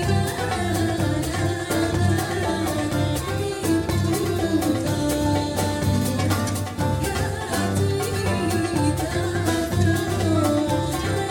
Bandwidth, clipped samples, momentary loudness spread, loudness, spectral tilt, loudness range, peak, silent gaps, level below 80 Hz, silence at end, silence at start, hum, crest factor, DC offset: 17.5 kHz; under 0.1%; 3 LU; -23 LUFS; -5.5 dB/octave; 1 LU; -8 dBFS; none; -38 dBFS; 0 s; 0 s; none; 14 dB; under 0.1%